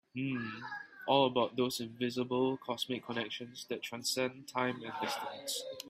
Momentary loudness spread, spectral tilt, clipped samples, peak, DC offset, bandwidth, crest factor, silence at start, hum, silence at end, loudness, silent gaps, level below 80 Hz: 11 LU; -4 dB/octave; under 0.1%; -14 dBFS; under 0.1%; 16 kHz; 22 dB; 0.15 s; none; 0 s; -36 LUFS; none; -78 dBFS